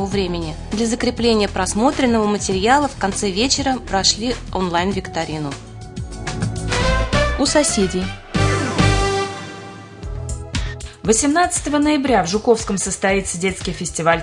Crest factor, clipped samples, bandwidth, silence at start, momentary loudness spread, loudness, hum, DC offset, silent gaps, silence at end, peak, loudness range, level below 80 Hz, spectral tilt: 18 dB; under 0.1%; 11 kHz; 0 s; 13 LU; -18 LUFS; none; under 0.1%; none; 0 s; 0 dBFS; 3 LU; -32 dBFS; -4 dB/octave